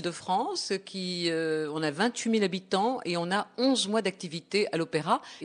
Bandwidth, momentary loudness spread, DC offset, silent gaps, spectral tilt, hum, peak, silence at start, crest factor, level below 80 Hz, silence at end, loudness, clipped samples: 10 kHz; 5 LU; under 0.1%; none; -4 dB/octave; none; -12 dBFS; 0 s; 18 dB; -76 dBFS; 0 s; -29 LUFS; under 0.1%